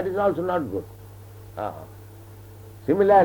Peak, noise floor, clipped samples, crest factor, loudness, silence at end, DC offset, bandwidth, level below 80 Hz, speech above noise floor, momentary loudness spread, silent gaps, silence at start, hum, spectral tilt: -6 dBFS; -43 dBFS; under 0.1%; 18 dB; -25 LUFS; 0 s; under 0.1%; 19.5 kHz; -54 dBFS; 22 dB; 22 LU; none; 0 s; none; -8 dB/octave